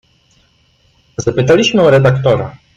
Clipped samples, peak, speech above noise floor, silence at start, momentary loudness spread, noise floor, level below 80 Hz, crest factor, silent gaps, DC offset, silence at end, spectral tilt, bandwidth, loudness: under 0.1%; -2 dBFS; 43 dB; 1.2 s; 10 LU; -54 dBFS; -42 dBFS; 12 dB; none; under 0.1%; 0.25 s; -6 dB/octave; 7.8 kHz; -11 LUFS